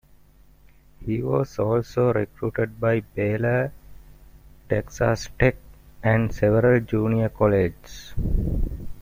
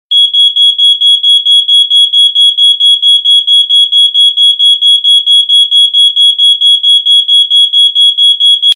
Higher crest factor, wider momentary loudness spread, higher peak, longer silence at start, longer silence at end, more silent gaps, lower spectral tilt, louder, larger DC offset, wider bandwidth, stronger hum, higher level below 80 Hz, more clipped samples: first, 22 dB vs 6 dB; first, 10 LU vs 1 LU; about the same, -2 dBFS vs 0 dBFS; first, 1 s vs 0.1 s; about the same, 0 s vs 0 s; neither; first, -7.5 dB/octave vs 6.5 dB/octave; second, -23 LUFS vs -3 LUFS; neither; about the same, 16 kHz vs 16.5 kHz; neither; first, -36 dBFS vs -64 dBFS; neither